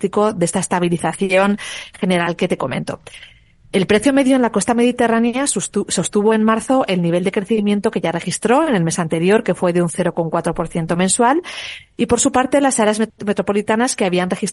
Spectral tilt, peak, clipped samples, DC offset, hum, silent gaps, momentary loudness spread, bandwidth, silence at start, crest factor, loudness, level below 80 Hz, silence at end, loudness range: -4.5 dB/octave; -2 dBFS; under 0.1%; under 0.1%; none; none; 7 LU; 11.5 kHz; 0 s; 14 dB; -17 LUFS; -48 dBFS; 0 s; 2 LU